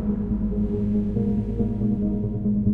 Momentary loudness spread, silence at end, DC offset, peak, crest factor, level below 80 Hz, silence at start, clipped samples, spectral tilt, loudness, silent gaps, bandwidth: 2 LU; 0 s; under 0.1%; -10 dBFS; 14 dB; -34 dBFS; 0 s; under 0.1%; -12.5 dB/octave; -25 LUFS; none; 2.8 kHz